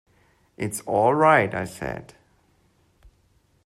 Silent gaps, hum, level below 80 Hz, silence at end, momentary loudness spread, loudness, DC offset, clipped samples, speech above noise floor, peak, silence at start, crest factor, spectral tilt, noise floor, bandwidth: none; none; -56 dBFS; 1.65 s; 16 LU; -22 LUFS; under 0.1%; under 0.1%; 41 dB; -6 dBFS; 0.6 s; 20 dB; -5.5 dB/octave; -63 dBFS; 14 kHz